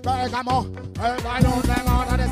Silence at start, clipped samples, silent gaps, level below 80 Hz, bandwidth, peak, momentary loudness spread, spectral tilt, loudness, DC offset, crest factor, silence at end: 0 s; under 0.1%; none; -28 dBFS; 16 kHz; -4 dBFS; 6 LU; -6 dB/octave; -22 LUFS; under 0.1%; 18 dB; 0 s